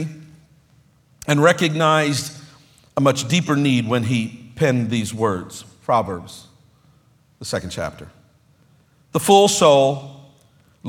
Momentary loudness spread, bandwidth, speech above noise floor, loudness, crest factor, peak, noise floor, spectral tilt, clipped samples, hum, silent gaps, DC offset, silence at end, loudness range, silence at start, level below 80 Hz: 18 LU; 18 kHz; 38 dB; -18 LUFS; 20 dB; 0 dBFS; -56 dBFS; -5 dB/octave; under 0.1%; none; none; under 0.1%; 0 s; 9 LU; 0 s; -56 dBFS